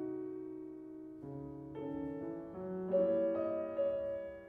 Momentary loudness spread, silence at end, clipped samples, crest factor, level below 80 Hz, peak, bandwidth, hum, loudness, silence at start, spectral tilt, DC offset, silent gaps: 15 LU; 0 s; under 0.1%; 16 dB; -68 dBFS; -22 dBFS; 3.6 kHz; none; -39 LUFS; 0 s; -10 dB/octave; under 0.1%; none